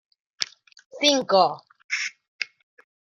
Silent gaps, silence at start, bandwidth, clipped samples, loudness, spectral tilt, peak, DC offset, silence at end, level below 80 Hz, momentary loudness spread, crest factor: 0.86-0.90 s, 1.84-1.89 s, 2.28-2.39 s; 0.4 s; 13.5 kHz; under 0.1%; -24 LUFS; -2 dB/octave; -2 dBFS; under 0.1%; 0.7 s; -78 dBFS; 14 LU; 24 dB